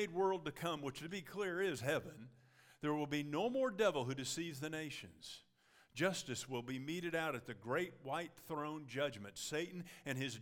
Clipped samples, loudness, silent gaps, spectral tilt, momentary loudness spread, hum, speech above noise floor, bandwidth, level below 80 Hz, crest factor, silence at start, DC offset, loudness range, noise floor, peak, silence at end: under 0.1%; -41 LUFS; none; -4.5 dB/octave; 11 LU; none; 30 dB; 18 kHz; -78 dBFS; 20 dB; 0 s; under 0.1%; 3 LU; -71 dBFS; -22 dBFS; 0 s